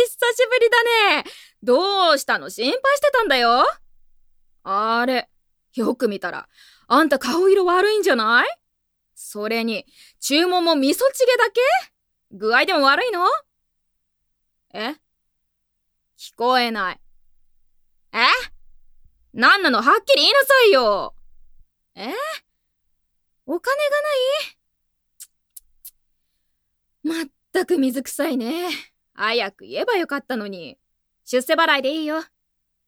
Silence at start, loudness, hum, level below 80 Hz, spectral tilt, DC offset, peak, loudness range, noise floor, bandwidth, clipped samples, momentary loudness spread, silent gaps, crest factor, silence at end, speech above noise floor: 0 s; -19 LUFS; none; -60 dBFS; -2 dB/octave; under 0.1%; 0 dBFS; 10 LU; -72 dBFS; 18 kHz; under 0.1%; 15 LU; none; 20 dB; 0.65 s; 53 dB